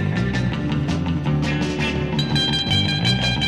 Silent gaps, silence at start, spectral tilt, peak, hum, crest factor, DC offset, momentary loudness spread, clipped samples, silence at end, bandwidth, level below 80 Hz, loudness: none; 0 s; -5.5 dB/octave; -6 dBFS; none; 14 dB; 0.4%; 4 LU; under 0.1%; 0 s; 11.5 kHz; -36 dBFS; -20 LUFS